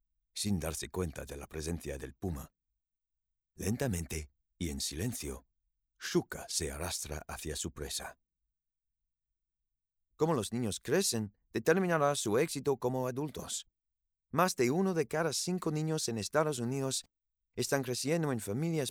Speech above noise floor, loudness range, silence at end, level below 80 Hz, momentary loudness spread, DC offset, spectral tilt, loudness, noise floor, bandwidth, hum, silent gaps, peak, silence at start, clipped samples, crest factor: 53 dB; 8 LU; 0 s; -56 dBFS; 11 LU; under 0.1%; -4.5 dB/octave; -34 LUFS; -87 dBFS; 18.5 kHz; none; none; -14 dBFS; 0.35 s; under 0.1%; 20 dB